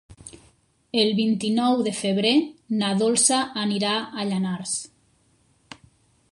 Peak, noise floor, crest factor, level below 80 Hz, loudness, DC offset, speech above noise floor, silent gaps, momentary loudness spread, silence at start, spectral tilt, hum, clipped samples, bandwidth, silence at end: -4 dBFS; -63 dBFS; 20 dB; -64 dBFS; -22 LUFS; under 0.1%; 40 dB; none; 10 LU; 0.1 s; -3.5 dB/octave; none; under 0.1%; 11.5 kHz; 1.45 s